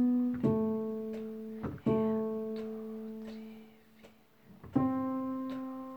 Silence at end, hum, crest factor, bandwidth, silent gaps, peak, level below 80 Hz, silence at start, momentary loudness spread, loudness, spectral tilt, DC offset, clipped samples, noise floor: 0 s; none; 18 dB; 20 kHz; none; -16 dBFS; -64 dBFS; 0 s; 14 LU; -35 LUFS; -9.5 dB/octave; under 0.1%; under 0.1%; -60 dBFS